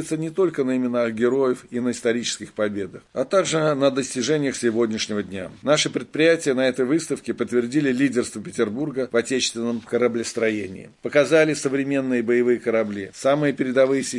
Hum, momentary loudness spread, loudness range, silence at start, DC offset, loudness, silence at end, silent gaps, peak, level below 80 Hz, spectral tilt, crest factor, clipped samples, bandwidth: none; 8 LU; 2 LU; 0 s; under 0.1%; -22 LUFS; 0 s; none; -4 dBFS; -64 dBFS; -4.5 dB/octave; 16 dB; under 0.1%; 11.5 kHz